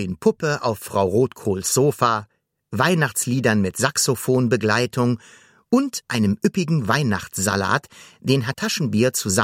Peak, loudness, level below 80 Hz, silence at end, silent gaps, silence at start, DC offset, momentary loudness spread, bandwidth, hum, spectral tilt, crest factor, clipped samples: -2 dBFS; -21 LUFS; -58 dBFS; 0 s; none; 0 s; under 0.1%; 5 LU; 16.5 kHz; none; -4.5 dB/octave; 20 dB; under 0.1%